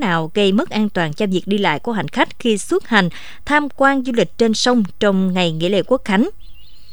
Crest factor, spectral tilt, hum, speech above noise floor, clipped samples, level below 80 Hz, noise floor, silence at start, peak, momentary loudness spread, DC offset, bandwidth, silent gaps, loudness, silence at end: 18 dB; -5 dB/octave; none; 23 dB; under 0.1%; -48 dBFS; -40 dBFS; 0 s; 0 dBFS; 4 LU; 3%; over 20 kHz; none; -17 LUFS; 0.35 s